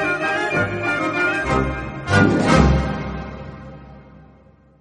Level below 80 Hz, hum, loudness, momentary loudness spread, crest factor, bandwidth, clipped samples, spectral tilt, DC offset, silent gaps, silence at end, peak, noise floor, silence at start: -30 dBFS; none; -19 LUFS; 19 LU; 20 dB; 10.5 kHz; under 0.1%; -6 dB/octave; under 0.1%; none; 0.6 s; 0 dBFS; -50 dBFS; 0 s